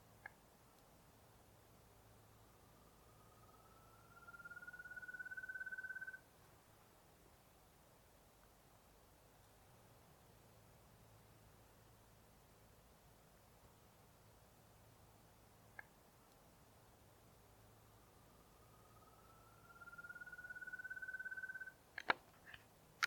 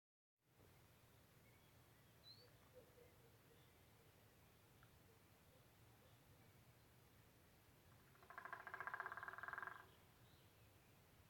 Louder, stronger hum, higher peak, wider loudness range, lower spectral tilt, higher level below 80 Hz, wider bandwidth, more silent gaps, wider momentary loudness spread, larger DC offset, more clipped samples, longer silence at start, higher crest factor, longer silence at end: first, -51 LUFS vs -55 LUFS; neither; first, -18 dBFS vs -34 dBFS; about the same, 15 LU vs 13 LU; about the same, -2.5 dB/octave vs -3.5 dB/octave; first, -76 dBFS vs -84 dBFS; about the same, 19 kHz vs 19 kHz; neither; about the same, 19 LU vs 18 LU; neither; neither; second, 0 s vs 0.4 s; first, 38 dB vs 28 dB; about the same, 0 s vs 0 s